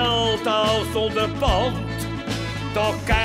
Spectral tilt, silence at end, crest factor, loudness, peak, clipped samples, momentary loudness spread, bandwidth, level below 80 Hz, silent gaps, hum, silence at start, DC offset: -5 dB/octave; 0 s; 16 dB; -22 LUFS; -6 dBFS; under 0.1%; 7 LU; 16 kHz; -32 dBFS; none; none; 0 s; under 0.1%